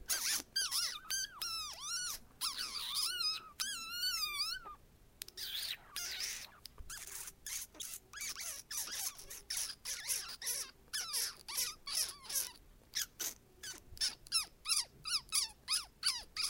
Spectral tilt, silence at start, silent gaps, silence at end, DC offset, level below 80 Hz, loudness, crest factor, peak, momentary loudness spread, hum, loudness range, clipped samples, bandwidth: 2 dB/octave; 0 s; none; 0 s; under 0.1%; -64 dBFS; -38 LUFS; 26 dB; -16 dBFS; 11 LU; none; 6 LU; under 0.1%; 17 kHz